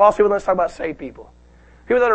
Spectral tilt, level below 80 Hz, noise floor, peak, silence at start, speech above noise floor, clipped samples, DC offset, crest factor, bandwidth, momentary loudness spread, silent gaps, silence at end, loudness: -6 dB/octave; -46 dBFS; -48 dBFS; -2 dBFS; 0 s; 31 dB; under 0.1%; under 0.1%; 18 dB; 8.6 kHz; 17 LU; none; 0 s; -19 LUFS